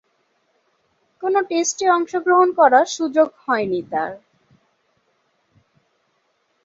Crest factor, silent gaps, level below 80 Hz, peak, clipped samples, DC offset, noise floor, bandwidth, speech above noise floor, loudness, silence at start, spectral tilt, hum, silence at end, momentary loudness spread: 20 dB; none; -70 dBFS; -2 dBFS; under 0.1%; under 0.1%; -67 dBFS; 8 kHz; 49 dB; -18 LUFS; 1.2 s; -3 dB/octave; none; 2.45 s; 11 LU